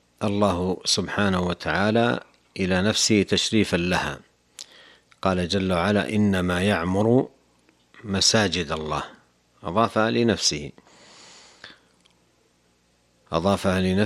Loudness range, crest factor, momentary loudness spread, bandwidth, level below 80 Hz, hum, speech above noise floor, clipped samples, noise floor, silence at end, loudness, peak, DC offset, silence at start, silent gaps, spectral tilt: 5 LU; 20 dB; 15 LU; 14.5 kHz; -50 dBFS; 60 Hz at -50 dBFS; 42 dB; under 0.1%; -64 dBFS; 0 s; -22 LUFS; -4 dBFS; under 0.1%; 0.2 s; none; -4 dB/octave